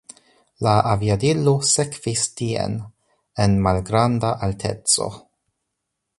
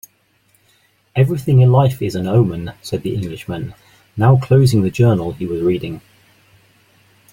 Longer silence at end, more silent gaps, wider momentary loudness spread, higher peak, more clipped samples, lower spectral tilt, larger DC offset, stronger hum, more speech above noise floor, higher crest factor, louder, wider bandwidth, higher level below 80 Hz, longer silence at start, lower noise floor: second, 1 s vs 1.35 s; neither; second, 7 LU vs 15 LU; about the same, -2 dBFS vs -2 dBFS; neither; second, -4.5 dB/octave vs -8 dB/octave; neither; neither; first, 59 dB vs 44 dB; about the same, 20 dB vs 16 dB; second, -20 LUFS vs -16 LUFS; second, 11.5 kHz vs 15.5 kHz; about the same, -42 dBFS vs -46 dBFS; second, 0.6 s vs 1.15 s; first, -79 dBFS vs -58 dBFS